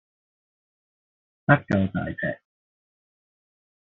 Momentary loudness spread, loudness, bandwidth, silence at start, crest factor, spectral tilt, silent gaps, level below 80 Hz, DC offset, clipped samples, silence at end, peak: 11 LU; -24 LUFS; 6.6 kHz; 1.5 s; 26 dB; -6.5 dB/octave; none; -60 dBFS; under 0.1%; under 0.1%; 1.5 s; -4 dBFS